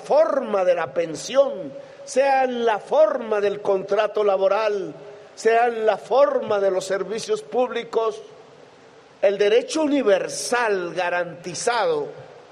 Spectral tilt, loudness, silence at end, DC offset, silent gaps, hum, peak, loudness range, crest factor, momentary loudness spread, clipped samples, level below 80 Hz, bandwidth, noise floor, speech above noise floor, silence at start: -3.5 dB/octave; -21 LUFS; 0.1 s; under 0.1%; none; none; -6 dBFS; 3 LU; 16 dB; 8 LU; under 0.1%; -72 dBFS; 13 kHz; -49 dBFS; 28 dB; 0 s